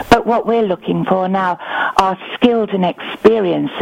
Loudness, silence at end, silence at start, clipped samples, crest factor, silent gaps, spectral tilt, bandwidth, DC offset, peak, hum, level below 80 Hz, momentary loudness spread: -15 LUFS; 0 s; 0 s; under 0.1%; 14 dB; none; -6 dB/octave; 16 kHz; under 0.1%; 0 dBFS; none; -42 dBFS; 6 LU